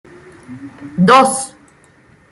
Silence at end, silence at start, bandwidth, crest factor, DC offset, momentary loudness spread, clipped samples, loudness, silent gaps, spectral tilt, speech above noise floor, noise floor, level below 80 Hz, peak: 0.85 s; 0.5 s; 12 kHz; 16 dB; under 0.1%; 25 LU; under 0.1%; -12 LUFS; none; -4.5 dB/octave; 35 dB; -49 dBFS; -56 dBFS; 0 dBFS